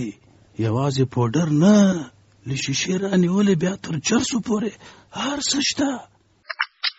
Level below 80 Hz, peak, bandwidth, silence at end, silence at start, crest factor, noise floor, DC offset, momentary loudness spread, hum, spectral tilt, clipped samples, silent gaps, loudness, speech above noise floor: -56 dBFS; -6 dBFS; 8 kHz; 0.05 s; 0 s; 16 dB; -40 dBFS; under 0.1%; 16 LU; none; -5 dB/octave; under 0.1%; none; -21 LUFS; 19 dB